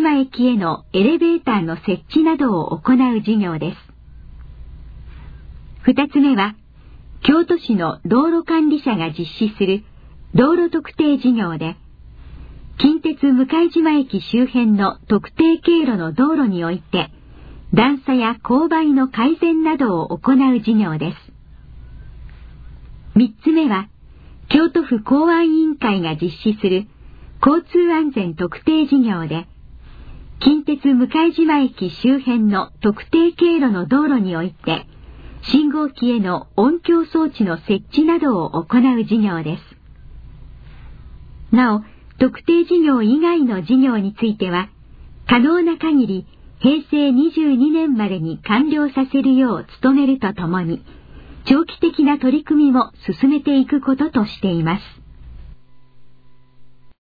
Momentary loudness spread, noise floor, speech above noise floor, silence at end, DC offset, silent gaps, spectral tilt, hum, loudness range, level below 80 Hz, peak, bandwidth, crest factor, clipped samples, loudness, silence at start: 7 LU; -42 dBFS; 26 dB; 0.25 s; under 0.1%; none; -9 dB/octave; none; 4 LU; -44 dBFS; -2 dBFS; 5 kHz; 16 dB; under 0.1%; -17 LUFS; 0 s